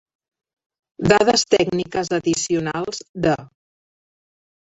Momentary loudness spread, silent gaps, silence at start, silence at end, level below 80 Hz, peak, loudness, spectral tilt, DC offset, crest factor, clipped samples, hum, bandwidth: 11 LU; 3.09-3.14 s; 1 s; 1.3 s; -52 dBFS; 0 dBFS; -20 LUFS; -4 dB/octave; under 0.1%; 22 dB; under 0.1%; none; 8.2 kHz